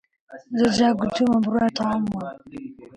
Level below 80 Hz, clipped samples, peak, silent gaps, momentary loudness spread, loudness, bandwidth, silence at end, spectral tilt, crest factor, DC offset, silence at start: -54 dBFS; under 0.1%; -8 dBFS; none; 18 LU; -22 LUFS; 10 kHz; 0.1 s; -5.5 dB/octave; 16 dB; under 0.1%; 0.3 s